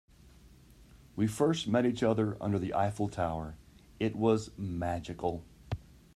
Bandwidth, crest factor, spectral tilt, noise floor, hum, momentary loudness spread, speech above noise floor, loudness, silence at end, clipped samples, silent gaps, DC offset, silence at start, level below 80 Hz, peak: 14 kHz; 18 dB; -6.5 dB/octave; -57 dBFS; none; 14 LU; 26 dB; -32 LUFS; 0.35 s; under 0.1%; none; under 0.1%; 0.25 s; -56 dBFS; -14 dBFS